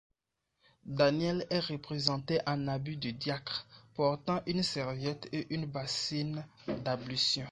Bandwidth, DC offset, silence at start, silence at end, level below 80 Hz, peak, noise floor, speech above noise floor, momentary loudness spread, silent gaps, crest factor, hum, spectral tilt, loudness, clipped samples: 11 kHz; under 0.1%; 0.85 s; 0 s; -64 dBFS; -8 dBFS; -84 dBFS; 50 dB; 9 LU; none; 26 dB; none; -5 dB/octave; -34 LUFS; under 0.1%